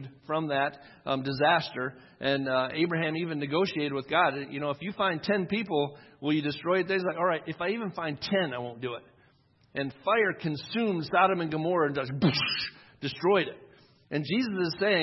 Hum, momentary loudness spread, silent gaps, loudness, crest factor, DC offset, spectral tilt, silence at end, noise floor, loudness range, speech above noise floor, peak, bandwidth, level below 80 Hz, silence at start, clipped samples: none; 10 LU; none; -29 LUFS; 20 dB; under 0.1%; -7 dB/octave; 0 s; -64 dBFS; 3 LU; 35 dB; -10 dBFS; 6 kHz; -68 dBFS; 0 s; under 0.1%